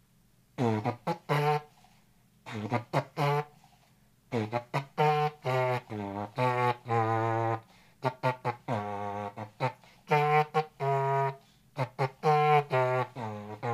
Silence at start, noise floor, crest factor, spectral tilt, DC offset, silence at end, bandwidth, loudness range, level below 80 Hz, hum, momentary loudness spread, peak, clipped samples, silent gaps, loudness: 0.6 s; -65 dBFS; 20 dB; -7 dB/octave; under 0.1%; 0 s; 15 kHz; 5 LU; -72 dBFS; none; 12 LU; -10 dBFS; under 0.1%; none; -30 LUFS